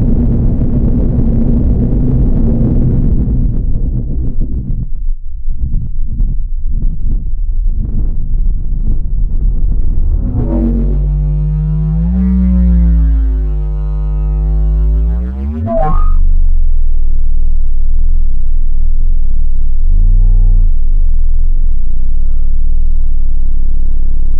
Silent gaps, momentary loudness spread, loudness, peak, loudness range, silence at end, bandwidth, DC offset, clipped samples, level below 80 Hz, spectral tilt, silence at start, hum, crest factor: none; 7 LU; -16 LUFS; -2 dBFS; 7 LU; 0 s; 1.5 kHz; under 0.1%; under 0.1%; -8 dBFS; -13 dB/octave; 0 s; none; 6 dB